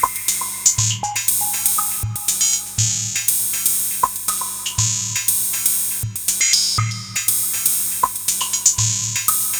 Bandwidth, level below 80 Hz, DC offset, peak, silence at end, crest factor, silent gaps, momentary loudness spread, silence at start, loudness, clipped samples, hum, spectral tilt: over 20 kHz; -46 dBFS; under 0.1%; 0 dBFS; 0 s; 20 dB; none; 6 LU; 0 s; -17 LUFS; under 0.1%; none; -0.5 dB/octave